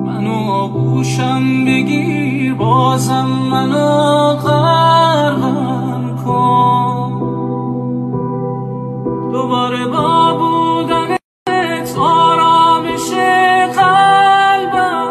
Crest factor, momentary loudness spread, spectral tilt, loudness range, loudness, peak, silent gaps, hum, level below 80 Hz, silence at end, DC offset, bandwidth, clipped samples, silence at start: 12 dB; 10 LU; -6 dB/octave; 6 LU; -13 LUFS; 0 dBFS; 11.24-11.46 s; none; -50 dBFS; 0 s; under 0.1%; 13 kHz; under 0.1%; 0 s